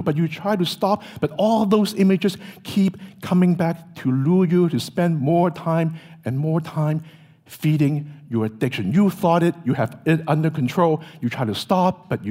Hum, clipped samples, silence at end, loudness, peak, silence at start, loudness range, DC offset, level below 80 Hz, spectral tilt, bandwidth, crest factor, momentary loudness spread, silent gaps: none; under 0.1%; 0 s; -21 LUFS; -4 dBFS; 0 s; 3 LU; under 0.1%; -62 dBFS; -7.5 dB/octave; 16 kHz; 16 dB; 8 LU; none